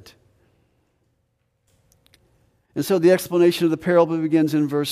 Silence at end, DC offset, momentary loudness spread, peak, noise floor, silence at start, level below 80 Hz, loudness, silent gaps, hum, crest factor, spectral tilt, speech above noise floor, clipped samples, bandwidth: 0 s; under 0.1%; 6 LU; -4 dBFS; -70 dBFS; 2.75 s; -64 dBFS; -19 LUFS; none; none; 18 dB; -6 dB/octave; 51 dB; under 0.1%; 15.5 kHz